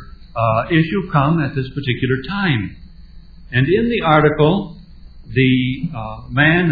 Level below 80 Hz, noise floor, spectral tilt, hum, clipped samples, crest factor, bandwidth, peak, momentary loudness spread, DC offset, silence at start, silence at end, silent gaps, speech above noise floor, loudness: -38 dBFS; -39 dBFS; -10 dB/octave; none; under 0.1%; 18 dB; 4.9 kHz; 0 dBFS; 11 LU; 0.2%; 0 s; 0 s; none; 22 dB; -17 LUFS